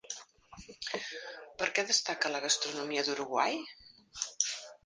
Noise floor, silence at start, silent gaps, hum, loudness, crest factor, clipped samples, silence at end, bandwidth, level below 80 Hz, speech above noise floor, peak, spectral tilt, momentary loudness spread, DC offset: -54 dBFS; 0.05 s; none; none; -32 LUFS; 24 dB; under 0.1%; 0.1 s; 10 kHz; -70 dBFS; 20 dB; -12 dBFS; 0 dB/octave; 17 LU; under 0.1%